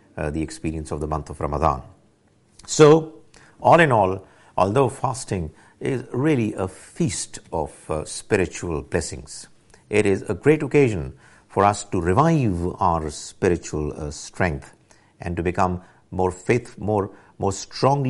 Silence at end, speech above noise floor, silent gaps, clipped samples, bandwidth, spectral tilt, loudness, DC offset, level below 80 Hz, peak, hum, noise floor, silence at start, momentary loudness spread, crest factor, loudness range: 0 s; 37 dB; none; under 0.1%; 11.5 kHz; -6 dB/octave; -22 LUFS; under 0.1%; -42 dBFS; -2 dBFS; none; -59 dBFS; 0.15 s; 14 LU; 20 dB; 7 LU